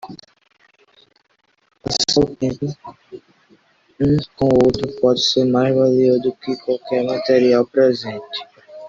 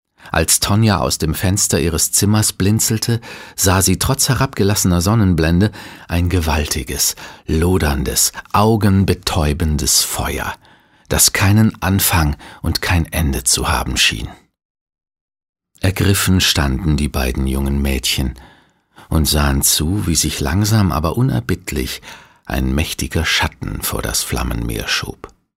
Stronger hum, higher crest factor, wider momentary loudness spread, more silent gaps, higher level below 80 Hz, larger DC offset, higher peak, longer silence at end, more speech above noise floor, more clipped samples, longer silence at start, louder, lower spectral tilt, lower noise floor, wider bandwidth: neither; about the same, 16 dB vs 16 dB; first, 14 LU vs 9 LU; second, none vs 14.65-14.75 s, 14.81-14.86 s, 15.21-15.28 s, 15.49-15.53 s; second, -48 dBFS vs -26 dBFS; neither; about the same, -2 dBFS vs 0 dBFS; second, 0 s vs 0.3 s; first, 39 dB vs 33 dB; neither; second, 0.05 s vs 0.25 s; about the same, -17 LUFS vs -16 LUFS; first, -5.5 dB/octave vs -4 dB/octave; first, -56 dBFS vs -49 dBFS; second, 7.8 kHz vs 16.5 kHz